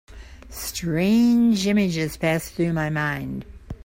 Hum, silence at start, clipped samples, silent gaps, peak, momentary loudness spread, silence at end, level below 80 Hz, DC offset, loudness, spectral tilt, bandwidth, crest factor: none; 0.1 s; under 0.1%; none; -10 dBFS; 15 LU; 0.1 s; -44 dBFS; under 0.1%; -22 LUFS; -5.5 dB/octave; 16.5 kHz; 14 dB